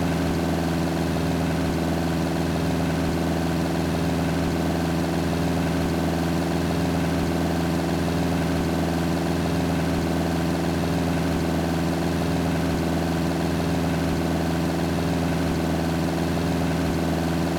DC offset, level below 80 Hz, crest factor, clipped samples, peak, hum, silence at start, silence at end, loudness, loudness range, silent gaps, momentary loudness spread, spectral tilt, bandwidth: under 0.1%; -40 dBFS; 10 dB; under 0.1%; -12 dBFS; none; 0 s; 0 s; -24 LUFS; 0 LU; none; 1 LU; -6 dB/octave; 19 kHz